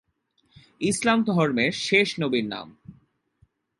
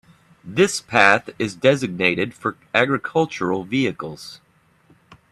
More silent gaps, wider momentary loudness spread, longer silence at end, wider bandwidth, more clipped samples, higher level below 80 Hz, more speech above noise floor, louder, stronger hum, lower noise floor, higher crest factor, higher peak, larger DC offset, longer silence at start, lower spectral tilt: neither; about the same, 12 LU vs 13 LU; about the same, 0.9 s vs 0.95 s; second, 11.5 kHz vs 13 kHz; neither; about the same, -62 dBFS vs -60 dBFS; first, 46 dB vs 37 dB; second, -23 LUFS vs -20 LUFS; neither; first, -69 dBFS vs -57 dBFS; about the same, 20 dB vs 22 dB; second, -6 dBFS vs 0 dBFS; neither; first, 0.8 s vs 0.45 s; about the same, -4.5 dB/octave vs -4.5 dB/octave